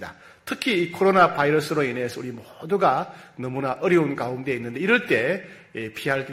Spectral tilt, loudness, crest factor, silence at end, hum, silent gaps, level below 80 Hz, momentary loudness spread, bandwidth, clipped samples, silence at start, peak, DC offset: -5.5 dB/octave; -23 LUFS; 20 dB; 0 s; none; none; -64 dBFS; 17 LU; 15.5 kHz; under 0.1%; 0 s; -4 dBFS; under 0.1%